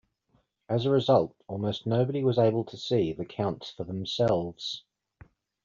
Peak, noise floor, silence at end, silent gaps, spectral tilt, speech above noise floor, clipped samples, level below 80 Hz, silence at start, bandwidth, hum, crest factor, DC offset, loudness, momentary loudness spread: -10 dBFS; -71 dBFS; 0.85 s; none; -6 dB/octave; 43 dB; under 0.1%; -62 dBFS; 0.7 s; 7.6 kHz; none; 18 dB; under 0.1%; -28 LUFS; 11 LU